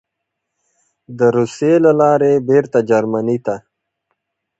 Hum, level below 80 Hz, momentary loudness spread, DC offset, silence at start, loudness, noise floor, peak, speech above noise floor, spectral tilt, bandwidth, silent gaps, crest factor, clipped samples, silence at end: none; -60 dBFS; 8 LU; under 0.1%; 1.1 s; -14 LUFS; -77 dBFS; 0 dBFS; 63 dB; -7.5 dB/octave; 8.2 kHz; none; 16 dB; under 0.1%; 1 s